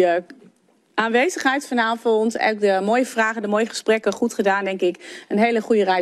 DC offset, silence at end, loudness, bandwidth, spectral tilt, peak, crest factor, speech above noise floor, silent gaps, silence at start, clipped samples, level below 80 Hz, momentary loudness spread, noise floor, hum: under 0.1%; 0 s; -20 LUFS; 13 kHz; -4 dB/octave; -4 dBFS; 16 dB; 38 dB; none; 0 s; under 0.1%; -72 dBFS; 5 LU; -58 dBFS; none